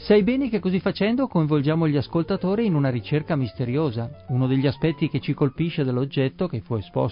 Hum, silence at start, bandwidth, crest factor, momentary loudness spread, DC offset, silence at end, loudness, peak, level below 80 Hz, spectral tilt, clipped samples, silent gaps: none; 0 s; 5.4 kHz; 16 dB; 5 LU; under 0.1%; 0 s; -23 LUFS; -6 dBFS; -50 dBFS; -12.5 dB/octave; under 0.1%; none